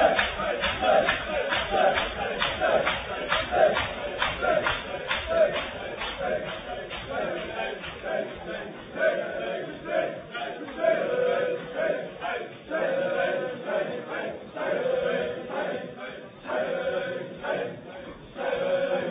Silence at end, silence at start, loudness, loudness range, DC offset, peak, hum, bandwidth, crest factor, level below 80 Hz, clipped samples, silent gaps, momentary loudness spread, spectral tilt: 0 s; 0 s; -28 LUFS; 6 LU; under 0.1%; -8 dBFS; none; 5 kHz; 20 dB; -50 dBFS; under 0.1%; none; 12 LU; -7 dB/octave